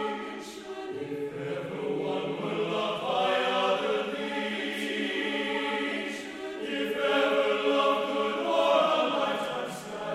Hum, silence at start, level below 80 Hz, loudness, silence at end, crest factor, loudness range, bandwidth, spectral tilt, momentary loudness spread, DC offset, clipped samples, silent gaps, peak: none; 0 s; -70 dBFS; -29 LUFS; 0 s; 18 dB; 4 LU; 15 kHz; -4 dB/octave; 12 LU; under 0.1%; under 0.1%; none; -12 dBFS